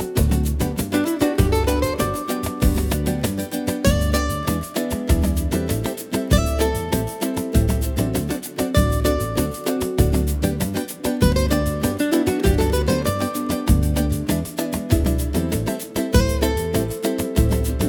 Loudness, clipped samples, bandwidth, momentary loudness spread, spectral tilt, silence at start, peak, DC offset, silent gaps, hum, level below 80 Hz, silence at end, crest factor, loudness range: -21 LUFS; under 0.1%; 18 kHz; 6 LU; -5.5 dB/octave; 0 s; -2 dBFS; under 0.1%; none; none; -26 dBFS; 0 s; 18 dB; 2 LU